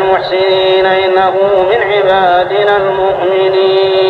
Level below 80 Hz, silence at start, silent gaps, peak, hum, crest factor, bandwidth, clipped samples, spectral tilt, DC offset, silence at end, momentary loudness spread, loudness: -44 dBFS; 0 s; none; 0 dBFS; none; 10 dB; 5 kHz; under 0.1%; -6 dB/octave; under 0.1%; 0 s; 2 LU; -10 LUFS